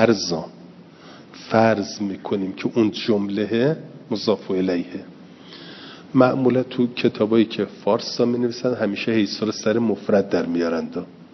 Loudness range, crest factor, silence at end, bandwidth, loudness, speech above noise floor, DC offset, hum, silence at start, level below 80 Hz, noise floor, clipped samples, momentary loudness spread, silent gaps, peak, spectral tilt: 3 LU; 20 dB; 0.1 s; 6.4 kHz; -21 LUFS; 23 dB; under 0.1%; none; 0 s; -66 dBFS; -44 dBFS; under 0.1%; 17 LU; none; -2 dBFS; -6 dB/octave